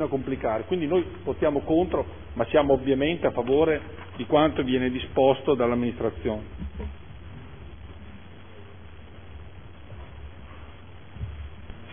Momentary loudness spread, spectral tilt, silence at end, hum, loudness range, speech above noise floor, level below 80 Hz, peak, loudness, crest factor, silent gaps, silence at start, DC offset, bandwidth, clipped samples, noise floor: 24 LU; -10.5 dB/octave; 0 s; none; 21 LU; 21 dB; -44 dBFS; -6 dBFS; -25 LUFS; 20 dB; none; 0 s; 0.5%; 3.6 kHz; under 0.1%; -46 dBFS